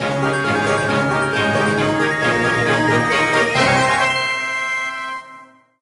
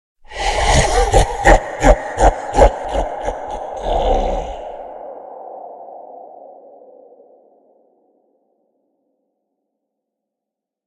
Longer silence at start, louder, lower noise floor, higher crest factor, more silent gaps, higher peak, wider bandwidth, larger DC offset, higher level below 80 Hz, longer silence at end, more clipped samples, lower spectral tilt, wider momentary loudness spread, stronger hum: second, 0 s vs 0.3 s; about the same, -17 LUFS vs -16 LUFS; second, -43 dBFS vs -84 dBFS; about the same, 16 dB vs 18 dB; neither; about the same, -2 dBFS vs 0 dBFS; about the same, 11.5 kHz vs 12 kHz; neither; second, -48 dBFS vs -24 dBFS; second, 0.4 s vs 4.3 s; neither; about the same, -4.5 dB/octave vs -4.5 dB/octave; second, 6 LU vs 21 LU; neither